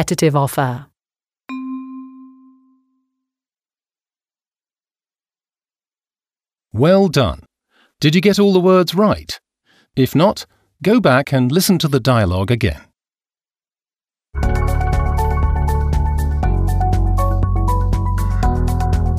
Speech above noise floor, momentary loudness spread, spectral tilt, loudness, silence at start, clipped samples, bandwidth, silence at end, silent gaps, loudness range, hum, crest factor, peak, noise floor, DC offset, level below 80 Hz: over 76 dB; 16 LU; -6.5 dB/octave; -16 LUFS; 0 s; under 0.1%; 16 kHz; 0 s; none; 11 LU; none; 16 dB; 0 dBFS; under -90 dBFS; under 0.1%; -24 dBFS